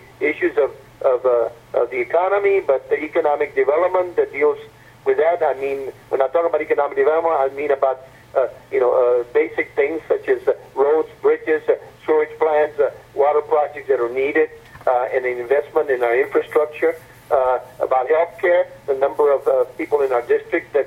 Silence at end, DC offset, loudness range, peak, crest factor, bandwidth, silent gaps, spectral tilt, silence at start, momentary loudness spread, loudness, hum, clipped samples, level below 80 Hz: 0 s; under 0.1%; 1 LU; -2 dBFS; 16 dB; 13 kHz; none; -6 dB/octave; 0.2 s; 5 LU; -19 LUFS; none; under 0.1%; -58 dBFS